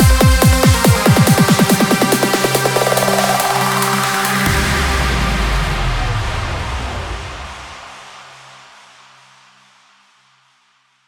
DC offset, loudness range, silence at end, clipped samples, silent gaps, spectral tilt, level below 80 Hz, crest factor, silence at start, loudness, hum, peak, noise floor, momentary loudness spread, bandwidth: under 0.1%; 17 LU; 2.75 s; under 0.1%; none; -4.5 dB/octave; -24 dBFS; 14 dB; 0 s; -14 LUFS; none; -2 dBFS; -58 dBFS; 17 LU; over 20 kHz